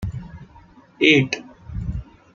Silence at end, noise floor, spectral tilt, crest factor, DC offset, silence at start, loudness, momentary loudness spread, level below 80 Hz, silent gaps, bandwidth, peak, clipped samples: 0.3 s; -49 dBFS; -5.5 dB/octave; 22 dB; under 0.1%; 0 s; -19 LUFS; 21 LU; -38 dBFS; none; 7.4 kHz; -2 dBFS; under 0.1%